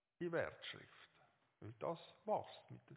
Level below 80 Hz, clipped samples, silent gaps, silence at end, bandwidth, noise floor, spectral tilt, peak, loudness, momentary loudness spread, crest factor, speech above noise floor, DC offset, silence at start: -80 dBFS; under 0.1%; none; 0 s; 4 kHz; -76 dBFS; -4 dB/octave; -28 dBFS; -46 LUFS; 19 LU; 20 dB; 29 dB; under 0.1%; 0.2 s